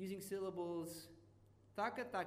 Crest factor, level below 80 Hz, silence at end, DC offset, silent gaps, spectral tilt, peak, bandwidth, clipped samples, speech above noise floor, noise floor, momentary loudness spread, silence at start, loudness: 18 dB; -78 dBFS; 0 s; under 0.1%; none; -5 dB/octave; -28 dBFS; 15.5 kHz; under 0.1%; 23 dB; -68 dBFS; 14 LU; 0 s; -46 LUFS